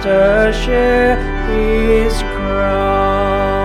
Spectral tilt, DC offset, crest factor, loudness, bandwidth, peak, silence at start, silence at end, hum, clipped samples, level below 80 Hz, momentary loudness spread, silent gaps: -6 dB/octave; under 0.1%; 12 dB; -14 LUFS; 13 kHz; -2 dBFS; 0 s; 0 s; none; under 0.1%; -20 dBFS; 6 LU; none